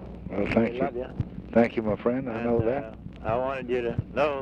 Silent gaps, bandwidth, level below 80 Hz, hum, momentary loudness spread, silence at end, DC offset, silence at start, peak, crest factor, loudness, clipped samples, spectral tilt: none; 7.2 kHz; -46 dBFS; none; 10 LU; 0 s; under 0.1%; 0 s; -8 dBFS; 20 dB; -28 LUFS; under 0.1%; -8.5 dB/octave